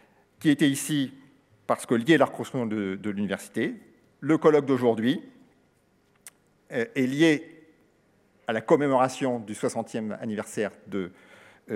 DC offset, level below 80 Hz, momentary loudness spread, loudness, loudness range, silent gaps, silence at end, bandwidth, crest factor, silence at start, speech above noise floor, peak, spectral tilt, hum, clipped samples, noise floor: under 0.1%; -78 dBFS; 13 LU; -26 LUFS; 3 LU; none; 0 s; 15.5 kHz; 22 dB; 0.4 s; 40 dB; -6 dBFS; -5.5 dB/octave; none; under 0.1%; -65 dBFS